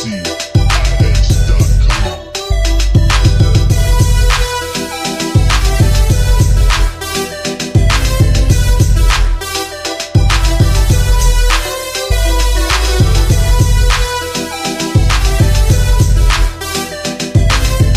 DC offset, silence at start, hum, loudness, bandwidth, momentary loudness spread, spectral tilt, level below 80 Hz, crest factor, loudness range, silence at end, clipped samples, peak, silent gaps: under 0.1%; 0 s; none; -13 LUFS; 15.5 kHz; 7 LU; -4.5 dB/octave; -12 dBFS; 10 dB; 1 LU; 0 s; under 0.1%; 0 dBFS; none